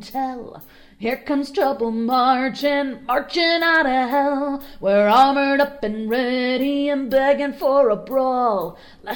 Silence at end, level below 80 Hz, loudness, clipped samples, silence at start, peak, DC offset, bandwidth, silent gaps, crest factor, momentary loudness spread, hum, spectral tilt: 0 s; -52 dBFS; -19 LUFS; under 0.1%; 0 s; -4 dBFS; under 0.1%; over 20 kHz; none; 16 dB; 11 LU; none; -5 dB/octave